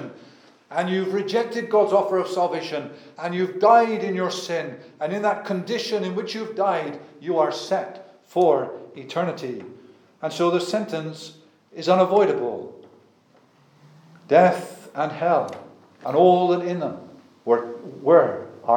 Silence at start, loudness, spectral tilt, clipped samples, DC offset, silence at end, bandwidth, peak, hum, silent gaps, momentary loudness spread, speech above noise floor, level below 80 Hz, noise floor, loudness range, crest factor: 0 s; -22 LUFS; -6 dB/octave; under 0.1%; under 0.1%; 0 s; 17.5 kHz; -4 dBFS; none; none; 18 LU; 36 dB; -84 dBFS; -58 dBFS; 4 LU; 20 dB